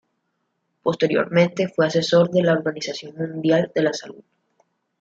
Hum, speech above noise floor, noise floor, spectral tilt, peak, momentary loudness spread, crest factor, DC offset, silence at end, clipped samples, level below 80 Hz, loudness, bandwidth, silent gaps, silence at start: none; 53 dB; -73 dBFS; -6 dB/octave; -4 dBFS; 12 LU; 18 dB; under 0.1%; 0.9 s; under 0.1%; -66 dBFS; -21 LUFS; 7.8 kHz; none; 0.85 s